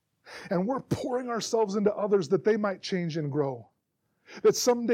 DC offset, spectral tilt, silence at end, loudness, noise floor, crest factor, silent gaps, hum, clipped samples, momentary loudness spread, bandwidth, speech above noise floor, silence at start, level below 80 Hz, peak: under 0.1%; -5 dB/octave; 0 s; -28 LUFS; -77 dBFS; 16 dB; none; none; under 0.1%; 7 LU; 16 kHz; 50 dB; 0.25 s; -68 dBFS; -12 dBFS